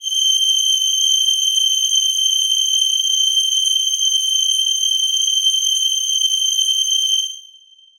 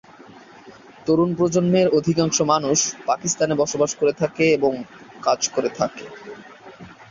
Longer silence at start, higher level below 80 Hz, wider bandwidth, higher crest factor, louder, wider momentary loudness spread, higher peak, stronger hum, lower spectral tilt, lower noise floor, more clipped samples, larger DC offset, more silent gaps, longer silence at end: second, 0 s vs 0.65 s; second, -66 dBFS vs -58 dBFS; first, over 20 kHz vs 7.6 kHz; second, 12 dB vs 18 dB; first, -14 LUFS vs -20 LUFS; second, 2 LU vs 16 LU; about the same, -4 dBFS vs -4 dBFS; neither; second, 7.5 dB/octave vs -4.5 dB/octave; about the same, -47 dBFS vs -45 dBFS; neither; neither; neither; first, 0.6 s vs 0.1 s